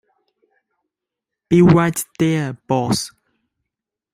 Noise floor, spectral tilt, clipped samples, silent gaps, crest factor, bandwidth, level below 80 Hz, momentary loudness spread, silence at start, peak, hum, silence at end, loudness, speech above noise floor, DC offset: -84 dBFS; -6 dB/octave; under 0.1%; none; 20 dB; 16 kHz; -50 dBFS; 10 LU; 1.5 s; 0 dBFS; none; 1.05 s; -17 LUFS; 68 dB; under 0.1%